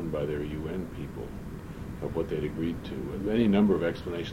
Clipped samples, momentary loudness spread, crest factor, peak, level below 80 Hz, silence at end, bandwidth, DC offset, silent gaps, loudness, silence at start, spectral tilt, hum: under 0.1%; 16 LU; 18 dB; -12 dBFS; -46 dBFS; 0 s; 16 kHz; under 0.1%; none; -30 LUFS; 0 s; -8 dB/octave; none